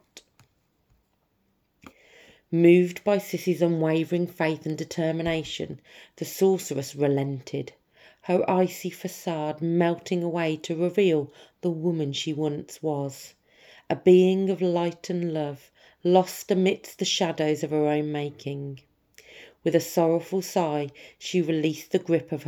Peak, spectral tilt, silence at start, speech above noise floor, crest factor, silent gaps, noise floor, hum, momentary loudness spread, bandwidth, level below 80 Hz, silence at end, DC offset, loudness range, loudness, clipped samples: -6 dBFS; -6 dB/octave; 0.15 s; 46 dB; 20 dB; none; -71 dBFS; none; 12 LU; 19 kHz; -66 dBFS; 0 s; under 0.1%; 4 LU; -25 LUFS; under 0.1%